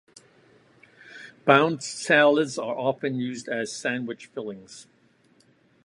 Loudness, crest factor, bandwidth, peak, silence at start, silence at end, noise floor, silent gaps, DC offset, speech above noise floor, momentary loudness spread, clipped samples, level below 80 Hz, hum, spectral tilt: -24 LUFS; 24 dB; 11.5 kHz; -2 dBFS; 1.05 s; 1.05 s; -61 dBFS; none; under 0.1%; 37 dB; 24 LU; under 0.1%; -74 dBFS; none; -4.5 dB/octave